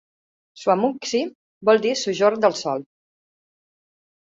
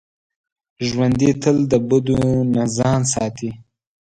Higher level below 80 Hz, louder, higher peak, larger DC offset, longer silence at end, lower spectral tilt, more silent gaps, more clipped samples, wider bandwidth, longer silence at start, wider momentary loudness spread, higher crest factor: second, -70 dBFS vs -44 dBFS; second, -21 LUFS vs -18 LUFS; about the same, -4 dBFS vs -2 dBFS; neither; first, 1.5 s vs 0.5 s; second, -4 dB/octave vs -6 dB/octave; first, 1.35-1.61 s vs none; neither; second, 7.8 kHz vs 10.5 kHz; second, 0.55 s vs 0.8 s; about the same, 9 LU vs 9 LU; about the same, 18 dB vs 16 dB